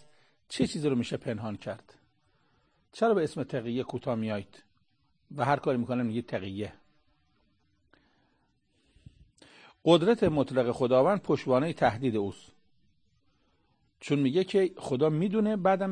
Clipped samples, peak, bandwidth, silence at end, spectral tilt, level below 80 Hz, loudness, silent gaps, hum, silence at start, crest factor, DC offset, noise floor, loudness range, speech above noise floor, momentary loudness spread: under 0.1%; -8 dBFS; 9.8 kHz; 0 s; -7 dB/octave; -62 dBFS; -29 LUFS; none; none; 0.5 s; 22 dB; under 0.1%; -73 dBFS; 8 LU; 45 dB; 13 LU